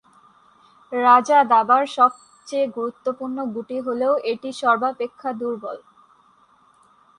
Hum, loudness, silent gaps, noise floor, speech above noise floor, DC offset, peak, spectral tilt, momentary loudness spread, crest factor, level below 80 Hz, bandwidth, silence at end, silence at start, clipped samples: none; -20 LUFS; none; -57 dBFS; 37 dB; under 0.1%; -2 dBFS; -4 dB/octave; 13 LU; 18 dB; -72 dBFS; 11 kHz; 1.4 s; 0.9 s; under 0.1%